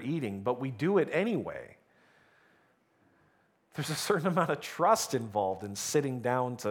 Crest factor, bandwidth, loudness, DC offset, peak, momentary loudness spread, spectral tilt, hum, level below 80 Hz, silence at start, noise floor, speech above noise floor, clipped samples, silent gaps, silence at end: 20 dB; 19.5 kHz; -31 LUFS; under 0.1%; -12 dBFS; 8 LU; -5 dB/octave; none; -74 dBFS; 0 s; -69 dBFS; 38 dB; under 0.1%; none; 0 s